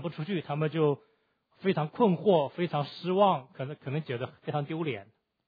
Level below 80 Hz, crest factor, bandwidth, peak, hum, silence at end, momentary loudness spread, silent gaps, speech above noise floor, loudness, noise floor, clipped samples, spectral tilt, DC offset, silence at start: -76 dBFS; 18 dB; 5 kHz; -12 dBFS; none; 0.45 s; 11 LU; none; 37 dB; -30 LUFS; -66 dBFS; under 0.1%; -10 dB/octave; under 0.1%; 0 s